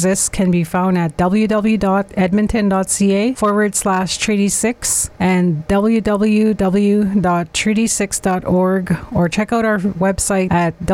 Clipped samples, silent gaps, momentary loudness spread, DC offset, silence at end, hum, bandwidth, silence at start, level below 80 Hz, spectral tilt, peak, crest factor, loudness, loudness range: under 0.1%; none; 2 LU; under 0.1%; 0 s; none; 16 kHz; 0 s; -38 dBFS; -5 dB/octave; -6 dBFS; 10 dB; -16 LUFS; 1 LU